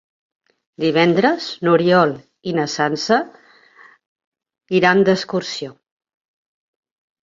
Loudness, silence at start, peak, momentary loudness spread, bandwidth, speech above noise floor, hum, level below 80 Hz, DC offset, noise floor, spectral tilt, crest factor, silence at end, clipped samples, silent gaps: -17 LUFS; 0.8 s; -2 dBFS; 14 LU; 7.6 kHz; 32 dB; none; -64 dBFS; under 0.1%; -49 dBFS; -5.5 dB/octave; 18 dB; 1.5 s; under 0.1%; 4.06-4.16 s, 4.27-4.32 s